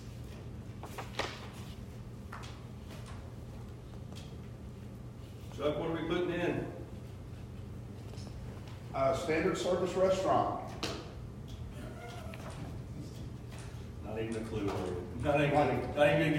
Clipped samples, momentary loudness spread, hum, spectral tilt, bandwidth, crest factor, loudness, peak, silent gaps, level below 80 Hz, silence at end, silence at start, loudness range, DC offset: under 0.1%; 17 LU; none; -6 dB/octave; 16 kHz; 22 dB; -36 LUFS; -14 dBFS; none; -52 dBFS; 0 s; 0 s; 13 LU; under 0.1%